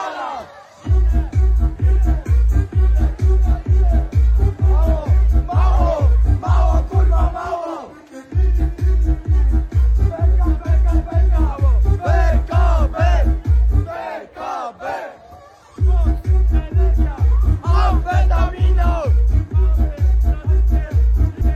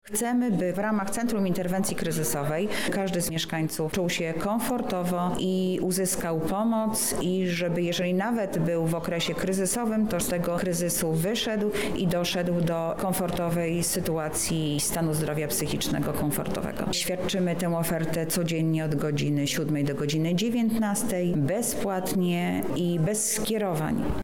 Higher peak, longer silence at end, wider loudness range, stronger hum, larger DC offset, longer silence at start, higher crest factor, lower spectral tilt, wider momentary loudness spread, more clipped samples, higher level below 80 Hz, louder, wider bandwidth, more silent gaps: first, -4 dBFS vs -14 dBFS; about the same, 0 s vs 0 s; about the same, 3 LU vs 1 LU; neither; second, under 0.1% vs 0.7%; about the same, 0 s vs 0 s; about the same, 10 dB vs 12 dB; first, -8.5 dB/octave vs -4.5 dB/octave; first, 9 LU vs 2 LU; neither; first, -16 dBFS vs -50 dBFS; first, -18 LUFS vs -27 LUFS; second, 6.4 kHz vs 19 kHz; neither